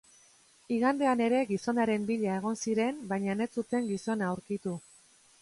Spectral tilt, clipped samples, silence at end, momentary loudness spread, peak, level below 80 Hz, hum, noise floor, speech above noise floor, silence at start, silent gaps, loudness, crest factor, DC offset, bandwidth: -6 dB/octave; under 0.1%; 0.65 s; 8 LU; -14 dBFS; -72 dBFS; none; -62 dBFS; 32 dB; 0.7 s; none; -31 LUFS; 16 dB; under 0.1%; 11.5 kHz